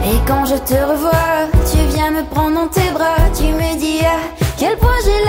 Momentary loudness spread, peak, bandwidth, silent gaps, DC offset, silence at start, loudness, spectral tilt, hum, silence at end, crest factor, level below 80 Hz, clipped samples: 3 LU; 0 dBFS; 16.5 kHz; none; under 0.1%; 0 s; -15 LUFS; -5.5 dB/octave; none; 0 s; 12 dB; -20 dBFS; under 0.1%